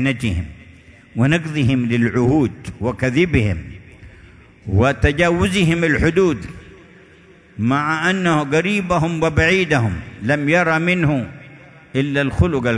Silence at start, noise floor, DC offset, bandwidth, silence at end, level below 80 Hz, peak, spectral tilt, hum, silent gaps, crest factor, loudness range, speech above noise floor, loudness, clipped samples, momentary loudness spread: 0 s; -47 dBFS; under 0.1%; 11 kHz; 0 s; -36 dBFS; 0 dBFS; -6.5 dB/octave; none; none; 18 dB; 2 LU; 30 dB; -18 LUFS; under 0.1%; 10 LU